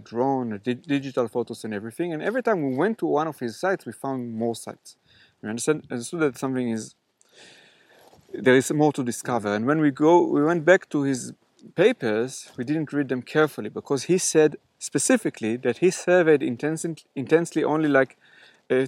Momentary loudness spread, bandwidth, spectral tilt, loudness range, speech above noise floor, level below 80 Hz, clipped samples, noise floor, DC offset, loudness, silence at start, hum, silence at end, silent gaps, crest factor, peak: 13 LU; 16 kHz; -5 dB/octave; 7 LU; 32 dB; -76 dBFS; under 0.1%; -55 dBFS; under 0.1%; -24 LUFS; 0 s; none; 0 s; none; 22 dB; -2 dBFS